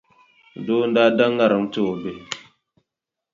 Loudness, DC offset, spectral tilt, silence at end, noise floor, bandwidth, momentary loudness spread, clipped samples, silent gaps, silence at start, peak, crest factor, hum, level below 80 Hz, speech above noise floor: -20 LUFS; under 0.1%; -5.5 dB/octave; 0.95 s; -85 dBFS; 7.6 kHz; 17 LU; under 0.1%; none; 0.55 s; -4 dBFS; 18 dB; none; -64 dBFS; 65 dB